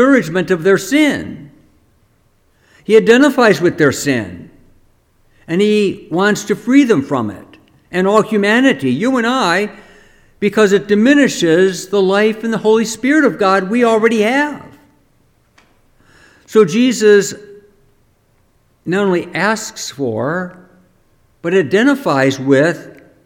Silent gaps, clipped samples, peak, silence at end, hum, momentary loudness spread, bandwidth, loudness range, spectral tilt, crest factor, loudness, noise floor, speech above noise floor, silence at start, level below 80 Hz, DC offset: none; under 0.1%; 0 dBFS; 0.35 s; none; 11 LU; 16.5 kHz; 4 LU; -5 dB/octave; 14 dB; -13 LUFS; -56 dBFS; 43 dB; 0 s; -54 dBFS; under 0.1%